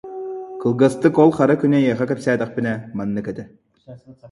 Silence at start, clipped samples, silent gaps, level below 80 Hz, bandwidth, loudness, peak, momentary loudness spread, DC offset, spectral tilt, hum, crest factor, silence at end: 0.05 s; under 0.1%; none; -58 dBFS; 11.5 kHz; -18 LUFS; 0 dBFS; 16 LU; under 0.1%; -7.5 dB/octave; none; 18 dB; 0.05 s